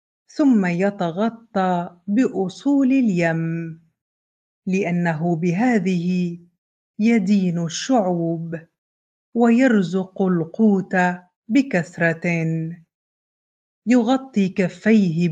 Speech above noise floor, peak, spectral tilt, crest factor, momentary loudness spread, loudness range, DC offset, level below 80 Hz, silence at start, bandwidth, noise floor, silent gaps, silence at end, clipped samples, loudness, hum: over 71 dB; -4 dBFS; -7 dB/octave; 16 dB; 10 LU; 3 LU; under 0.1%; -68 dBFS; 0.35 s; 8.8 kHz; under -90 dBFS; 4.01-4.62 s, 6.58-6.94 s, 8.78-9.33 s, 11.36-11.42 s, 12.94-13.82 s; 0 s; under 0.1%; -20 LUFS; none